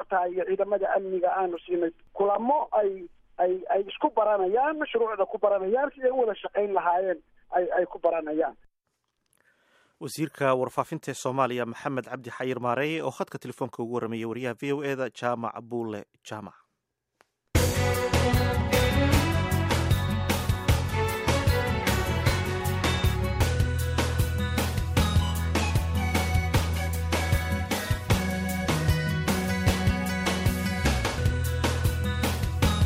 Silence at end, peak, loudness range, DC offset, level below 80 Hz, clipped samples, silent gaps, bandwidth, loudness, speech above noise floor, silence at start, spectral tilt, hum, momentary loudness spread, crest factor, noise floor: 0 s; -10 dBFS; 6 LU; under 0.1%; -36 dBFS; under 0.1%; none; 16 kHz; -27 LUFS; 54 dB; 0 s; -5.5 dB/octave; none; 8 LU; 16 dB; -81 dBFS